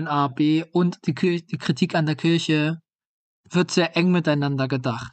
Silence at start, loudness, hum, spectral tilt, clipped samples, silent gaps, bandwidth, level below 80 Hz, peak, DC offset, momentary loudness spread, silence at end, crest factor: 0 s; -22 LUFS; none; -6 dB/octave; under 0.1%; 2.95-2.99 s, 3.05-3.44 s; 9 kHz; -64 dBFS; -6 dBFS; under 0.1%; 6 LU; 0.05 s; 16 dB